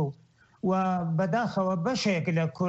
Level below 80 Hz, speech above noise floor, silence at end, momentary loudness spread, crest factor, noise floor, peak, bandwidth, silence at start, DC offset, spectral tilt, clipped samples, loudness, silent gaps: -64 dBFS; 33 dB; 0 s; 3 LU; 12 dB; -59 dBFS; -16 dBFS; 8.2 kHz; 0 s; under 0.1%; -6.5 dB/octave; under 0.1%; -28 LUFS; none